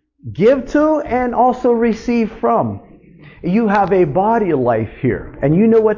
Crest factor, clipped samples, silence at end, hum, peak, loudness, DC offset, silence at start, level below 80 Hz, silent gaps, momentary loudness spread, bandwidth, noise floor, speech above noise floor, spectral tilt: 14 dB; under 0.1%; 0 s; none; -2 dBFS; -15 LUFS; under 0.1%; 0.25 s; -42 dBFS; none; 7 LU; 7.2 kHz; -41 dBFS; 27 dB; -8.5 dB/octave